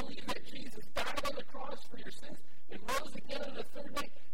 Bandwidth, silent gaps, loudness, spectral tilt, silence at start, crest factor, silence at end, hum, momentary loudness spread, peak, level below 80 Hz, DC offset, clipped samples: 16.5 kHz; none; -42 LUFS; -3.5 dB/octave; 0 s; 22 dB; 0 s; none; 12 LU; -20 dBFS; -56 dBFS; 4%; under 0.1%